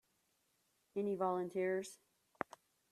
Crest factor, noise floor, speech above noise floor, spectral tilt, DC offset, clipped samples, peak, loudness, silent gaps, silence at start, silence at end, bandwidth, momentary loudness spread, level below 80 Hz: 24 dB; -80 dBFS; 41 dB; -6 dB/octave; under 0.1%; under 0.1%; -18 dBFS; -41 LUFS; none; 0.95 s; 0.95 s; 13.5 kHz; 10 LU; -86 dBFS